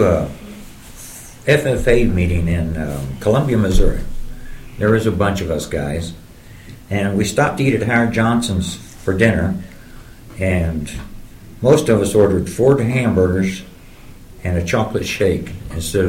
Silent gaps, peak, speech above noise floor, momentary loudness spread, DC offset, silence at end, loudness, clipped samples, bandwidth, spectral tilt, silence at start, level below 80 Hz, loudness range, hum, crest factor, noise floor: none; 0 dBFS; 22 dB; 19 LU; under 0.1%; 0 s; -17 LUFS; under 0.1%; 16.5 kHz; -6 dB/octave; 0 s; -28 dBFS; 4 LU; none; 16 dB; -38 dBFS